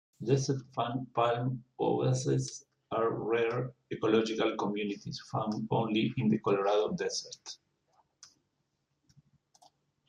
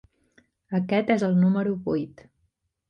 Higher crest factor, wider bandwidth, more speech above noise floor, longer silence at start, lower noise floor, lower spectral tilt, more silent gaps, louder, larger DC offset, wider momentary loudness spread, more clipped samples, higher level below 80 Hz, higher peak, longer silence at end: about the same, 18 dB vs 18 dB; first, 10 kHz vs 7.2 kHz; about the same, 49 dB vs 50 dB; second, 0.2 s vs 0.7 s; first, -80 dBFS vs -73 dBFS; second, -6 dB/octave vs -8.5 dB/octave; neither; second, -32 LUFS vs -24 LUFS; neither; about the same, 10 LU vs 9 LU; neither; second, -70 dBFS vs -62 dBFS; second, -14 dBFS vs -8 dBFS; first, 1.85 s vs 0.8 s